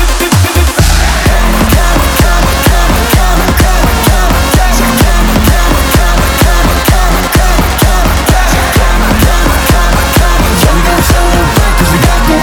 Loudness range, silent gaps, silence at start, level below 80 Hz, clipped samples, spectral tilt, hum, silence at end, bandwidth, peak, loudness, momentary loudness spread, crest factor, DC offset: 0 LU; none; 0 s; -10 dBFS; 0.3%; -4.5 dB/octave; none; 0 s; over 20 kHz; 0 dBFS; -8 LUFS; 1 LU; 6 dB; under 0.1%